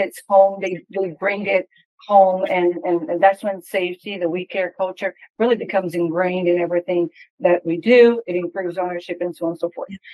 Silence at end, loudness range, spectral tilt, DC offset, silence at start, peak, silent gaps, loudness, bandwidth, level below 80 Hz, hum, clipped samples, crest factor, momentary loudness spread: 0 s; 3 LU; -6.5 dB/octave; under 0.1%; 0 s; -2 dBFS; 1.85-1.98 s, 5.30-5.34 s, 7.30-7.38 s; -19 LUFS; 12.5 kHz; -72 dBFS; none; under 0.1%; 18 dB; 11 LU